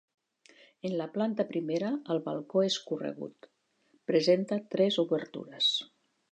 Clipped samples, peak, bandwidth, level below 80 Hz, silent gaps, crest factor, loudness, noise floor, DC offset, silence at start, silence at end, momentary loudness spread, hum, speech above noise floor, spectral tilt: under 0.1%; -12 dBFS; 9.2 kHz; -84 dBFS; none; 20 dB; -30 LUFS; -70 dBFS; under 0.1%; 0.85 s; 0.45 s; 12 LU; none; 40 dB; -5 dB/octave